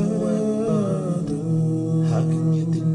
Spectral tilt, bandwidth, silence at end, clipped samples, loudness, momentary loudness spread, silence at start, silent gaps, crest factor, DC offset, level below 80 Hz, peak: -9 dB/octave; 10.5 kHz; 0 s; under 0.1%; -22 LUFS; 3 LU; 0 s; none; 10 dB; under 0.1%; -52 dBFS; -10 dBFS